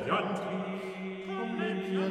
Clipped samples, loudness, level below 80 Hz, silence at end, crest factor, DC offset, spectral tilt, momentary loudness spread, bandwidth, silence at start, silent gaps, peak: under 0.1%; -34 LUFS; -74 dBFS; 0 s; 16 dB; under 0.1%; -6.5 dB/octave; 7 LU; 10.5 kHz; 0 s; none; -16 dBFS